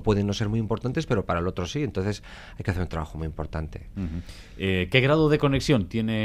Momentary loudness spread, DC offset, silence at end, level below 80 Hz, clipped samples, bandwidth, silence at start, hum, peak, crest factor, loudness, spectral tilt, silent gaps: 14 LU; under 0.1%; 0 s; -42 dBFS; under 0.1%; 14 kHz; 0 s; none; -2 dBFS; 24 dB; -26 LUFS; -6.5 dB/octave; none